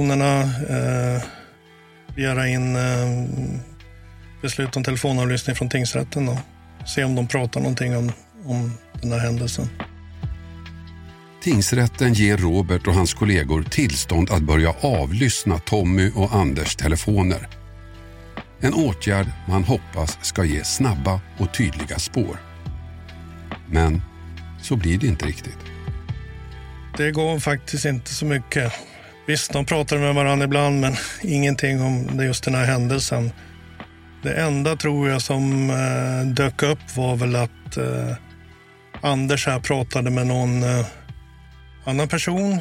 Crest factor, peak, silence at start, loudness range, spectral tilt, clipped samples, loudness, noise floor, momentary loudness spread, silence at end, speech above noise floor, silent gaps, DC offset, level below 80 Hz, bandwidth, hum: 18 dB; -4 dBFS; 0 s; 5 LU; -5.5 dB/octave; under 0.1%; -21 LUFS; -49 dBFS; 17 LU; 0 s; 28 dB; none; under 0.1%; -36 dBFS; 16.5 kHz; none